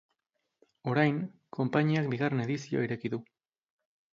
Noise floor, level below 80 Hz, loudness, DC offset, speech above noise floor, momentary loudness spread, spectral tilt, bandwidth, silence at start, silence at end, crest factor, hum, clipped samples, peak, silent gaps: -83 dBFS; -72 dBFS; -31 LUFS; under 0.1%; 53 dB; 11 LU; -7.5 dB/octave; 7.4 kHz; 0.85 s; 0.9 s; 22 dB; none; under 0.1%; -10 dBFS; none